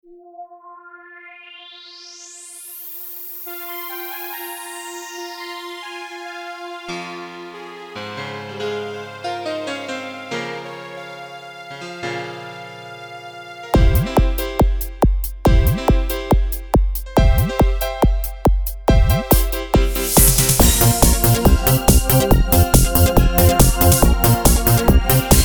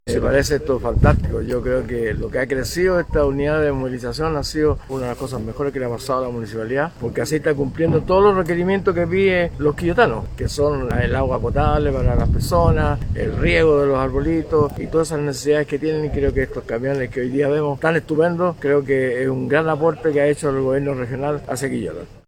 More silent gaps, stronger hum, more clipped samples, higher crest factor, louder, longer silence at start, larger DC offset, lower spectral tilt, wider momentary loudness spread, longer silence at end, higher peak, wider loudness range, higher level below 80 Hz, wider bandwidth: neither; neither; neither; about the same, 18 dB vs 18 dB; about the same, -17 LUFS vs -19 LUFS; first, 0.4 s vs 0.05 s; neither; second, -4.5 dB/octave vs -6.5 dB/octave; first, 21 LU vs 7 LU; second, 0 s vs 0.15 s; about the same, 0 dBFS vs 0 dBFS; first, 16 LU vs 4 LU; first, -22 dBFS vs -30 dBFS; first, over 20 kHz vs 17.5 kHz